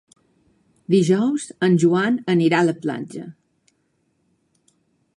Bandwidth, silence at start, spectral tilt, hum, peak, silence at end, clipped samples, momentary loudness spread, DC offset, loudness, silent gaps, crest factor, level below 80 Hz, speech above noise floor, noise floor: 11.5 kHz; 0.9 s; -6.5 dB/octave; none; -4 dBFS; 1.85 s; under 0.1%; 18 LU; under 0.1%; -19 LUFS; none; 18 dB; -68 dBFS; 49 dB; -68 dBFS